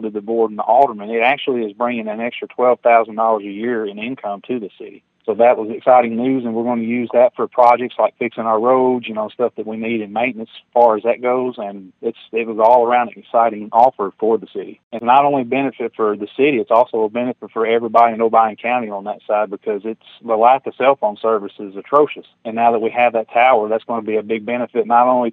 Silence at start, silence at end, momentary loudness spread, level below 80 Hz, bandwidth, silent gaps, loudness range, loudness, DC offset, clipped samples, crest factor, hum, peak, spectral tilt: 0 s; 0 s; 12 LU; -72 dBFS; 4.8 kHz; 14.83-14.91 s; 3 LU; -17 LUFS; under 0.1%; under 0.1%; 16 dB; none; 0 dBFS; -7.5 dB/octave